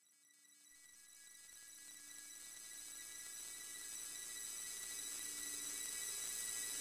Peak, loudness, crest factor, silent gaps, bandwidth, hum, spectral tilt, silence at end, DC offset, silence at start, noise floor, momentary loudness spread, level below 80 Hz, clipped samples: -32 dBFS; -46 LUFS; 18 dB; none; 16 kHz; none; 2 dB/octave; 0 s; under 0.1%; 0 s; -70 dBFS; 18 LU; -82 dBFS; under 0.1%